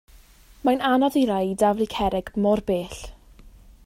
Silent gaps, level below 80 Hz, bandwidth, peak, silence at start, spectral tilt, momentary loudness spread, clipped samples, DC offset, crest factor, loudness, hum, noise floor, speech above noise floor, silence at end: none; -46 dBFS; 16 kHz; -8 dBFS; 0.65 s; -6 dB/octave; 10 LU; under 0.1%; under 0.1%; 16 dB; -23 LUFS; none; -50 dBFS; 28 dB; 0.75 s